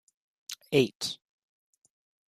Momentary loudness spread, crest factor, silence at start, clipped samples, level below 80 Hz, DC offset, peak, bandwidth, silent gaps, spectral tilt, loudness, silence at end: 18 LU; 24 dB; 0.5 s; under 0.1%; -72 dBFS; under 0.1%; -10 dBFS; 14.5 kHz; 0.95-1.00 s; -4.5 dB/octave; -29 LUFS; 1.15 s